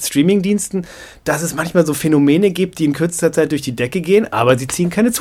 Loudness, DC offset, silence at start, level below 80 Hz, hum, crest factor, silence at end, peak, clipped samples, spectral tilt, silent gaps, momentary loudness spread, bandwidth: -16 LUFS; under 0.1%; 0 s; -48 dBFS; none; 16 dB; 0 s; 0 dBFS; under 0.1%; -5 dB/octave; none; 7 LU; 20 kHz